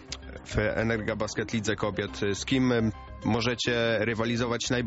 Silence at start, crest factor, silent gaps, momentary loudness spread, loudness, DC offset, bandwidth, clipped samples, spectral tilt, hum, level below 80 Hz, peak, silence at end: 0 s; 16 dB; none; 6 LU; -28 LUFS; under 0.1%; 8 kHz; under 0.1%; -4.5 dB/octave; none; -46 dBFS; -12 dBFS; 0 s